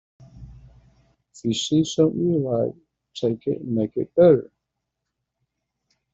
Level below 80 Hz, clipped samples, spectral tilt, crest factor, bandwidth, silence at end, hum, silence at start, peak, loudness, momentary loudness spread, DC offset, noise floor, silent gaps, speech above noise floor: -56 dBFS; under 0.1%; -6.5 dB/octave; 20 dB; 8 kHz; 1.7 s; none; 0.35 s; -4 dBFS; -22 LUFS; 11 LU; under 0.1%; -81 dBFS; none; 60 dB